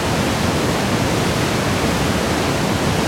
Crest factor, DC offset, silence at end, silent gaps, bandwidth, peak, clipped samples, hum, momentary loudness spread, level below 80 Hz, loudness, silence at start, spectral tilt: 12 dB; under 0.1%; 0 s; none; 16.5 kHz; -6 dBFS; under 0.1%; none; 0 LU; -34 dBFS; -18 LUFS; 0 s; -4.5 dB/octave